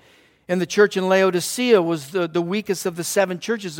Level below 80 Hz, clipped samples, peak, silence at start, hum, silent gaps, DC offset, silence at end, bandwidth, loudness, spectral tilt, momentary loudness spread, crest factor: -68 dBFS; under 0.1%; -2 dBFS; 0.5 s; none; none; under 0.1%; 0 s; 17 kHz; -20 LUFS; -4.5 dB/octave; 7 LU; 18 dB